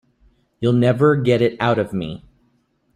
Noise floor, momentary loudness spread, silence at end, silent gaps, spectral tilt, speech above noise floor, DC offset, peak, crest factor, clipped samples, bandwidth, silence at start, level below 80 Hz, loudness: -63 dBFS; 13 LU; 0.8 s; none; -8 dB/octave; 46 dB; under 0.1%; -2 dBFS; 16 dB; under 0.1%; 10.5 kHz; 0.6 s; -52 dBFS; -18 LUFS